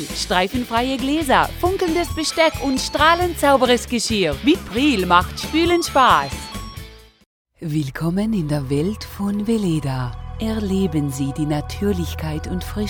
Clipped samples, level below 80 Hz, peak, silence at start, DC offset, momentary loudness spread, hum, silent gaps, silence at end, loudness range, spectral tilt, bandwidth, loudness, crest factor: under 0.1%; -36 dBFS; 0 dBFS; 0 s; under 0.1%; 11 LU; none; 7.26-7.45 s; 0 s; 6 LU; -5 dB/octave; over 20 kHz; -19 LUFS; 18 dB